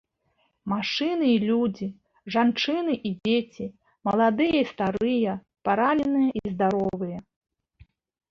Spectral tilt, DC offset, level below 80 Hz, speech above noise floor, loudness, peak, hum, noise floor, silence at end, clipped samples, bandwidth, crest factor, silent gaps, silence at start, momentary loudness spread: -6.5 dB/octave; under 0.1%; -60 dBFS; 47 dB; -25 LUFS; -8 dBFS; none; -71 dBFS; 1.1 s; under 0.1%; 6.8 kHz; 16 dB; none; 0.65 s; 13 LU